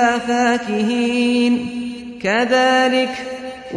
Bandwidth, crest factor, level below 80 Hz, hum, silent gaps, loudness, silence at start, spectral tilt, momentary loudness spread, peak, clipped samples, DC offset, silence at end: 10.5 kHz; 14 dB; -54 dBFS; none; none; -17 LUFS; 0 s; -4 dB/octave; 13 LU; -4 dBFS; under 0.1%; under 0.1%; 0 s